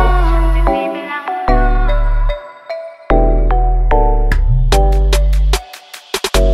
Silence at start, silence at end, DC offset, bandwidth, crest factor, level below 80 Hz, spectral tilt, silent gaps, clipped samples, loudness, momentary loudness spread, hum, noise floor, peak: 0 s; 0 s; under 0.1%; 13.5 kHz; 12 dB; -12 dBFS; -5.5 dB/octave; none; under 0.1%; -15 LUFS; 13 LU; none; -35 dBFS; 0 dBFS